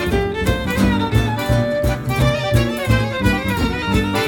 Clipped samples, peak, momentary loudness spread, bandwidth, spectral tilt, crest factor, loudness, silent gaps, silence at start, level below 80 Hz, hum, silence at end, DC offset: under 0.1%; -2 dBFS; 3 LU; 17.5 kHz; -6 dB/octave; 14 dB; -18 LUFS; none; 0 s; -26 dBFS; none; 0 s; under 0.1%